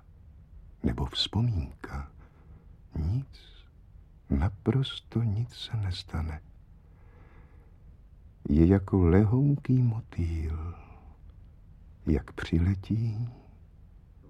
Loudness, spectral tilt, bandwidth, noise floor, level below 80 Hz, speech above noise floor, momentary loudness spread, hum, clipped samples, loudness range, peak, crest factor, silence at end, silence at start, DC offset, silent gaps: -29 LUFS; -8 dB/octave; 9.6 kHz; -53 dBFS; -40 dBFS; 26 dB; 18 LU; none; under 0.1%; 9 LU; -8 dBFS; 22 dB; 0.45 s; 0.4 s; under 0.1%; none